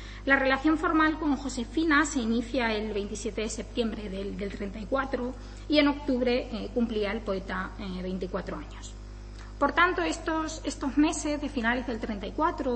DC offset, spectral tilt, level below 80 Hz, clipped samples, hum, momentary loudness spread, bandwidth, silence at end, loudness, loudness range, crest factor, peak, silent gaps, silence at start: under 0.1%; -4.5 dB/octave; -42 dBFS; under 0.1%; 50 Hz at -40 dBFS; 12 LU; 8.8 kHz; 0 s; -28 LUFS; 5 LU; 20 dB; -8 dBFS; none; 0 s